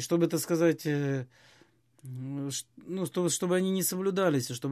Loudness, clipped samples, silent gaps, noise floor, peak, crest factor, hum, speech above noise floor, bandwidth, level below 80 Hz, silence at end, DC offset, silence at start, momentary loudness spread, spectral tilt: -29 LUFS; under 0.1%; none; -63 dBFS; -14 dBFS; 16 dB; none; 34 dB; 15 kHz; -76 dBFS; 0 s; under 0.1%; 0 s; 12 LU; -5 dB/octave